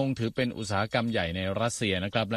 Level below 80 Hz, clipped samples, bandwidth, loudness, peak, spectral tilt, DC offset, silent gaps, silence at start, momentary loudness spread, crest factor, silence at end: -54 dBFS; under 0.1%; 13.5 kHz; -29 LUFS; -12 dBFS; -5 dB/octave; under 0.1%; none; 0 s; 3 LU; 16 dB; 0 s